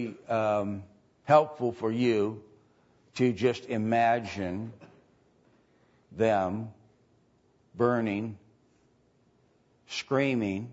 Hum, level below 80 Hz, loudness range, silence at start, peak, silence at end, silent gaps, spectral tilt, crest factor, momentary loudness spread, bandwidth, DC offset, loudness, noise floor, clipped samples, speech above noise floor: none; -68 dBFS; 6 LU; 0 s; -8 dBFS; 0 s; none; -6.5 dB/octave; 22 dB; 18 LU; 8 kHz; under 0.1%; -28 LUFS; -66 dBFS; under 0.1%; 39 dB